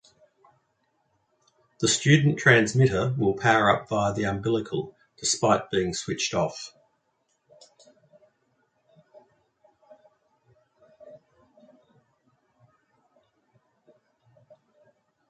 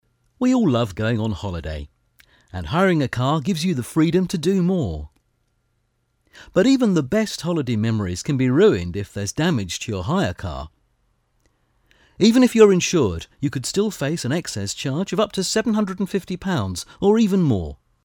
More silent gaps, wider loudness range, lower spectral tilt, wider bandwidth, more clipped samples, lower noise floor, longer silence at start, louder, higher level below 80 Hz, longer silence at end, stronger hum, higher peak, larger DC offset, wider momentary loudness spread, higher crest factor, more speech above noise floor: neither; first, 11 LU vs 4 LU; about the same, -4.5 dB/octave vs -5.5 dB/octave; second, 9.4 kHz vs 18.5 kHz; neither; first, -73 dBFS vs -68 dBFS; first, 1.8 s vs 0.4 s; second, -23 LUFS vs -20 LUFS; second, -58 dBFS vs -44 dBFS; first, 4.15 s vs 0.3 s; neither; second, -4 dBFS vs 0 dBFS; neither; about the same, 12 LU vs 12 LU; about the same, 24 dB vs 20 dB; about the same, 50 dB vs 49 dB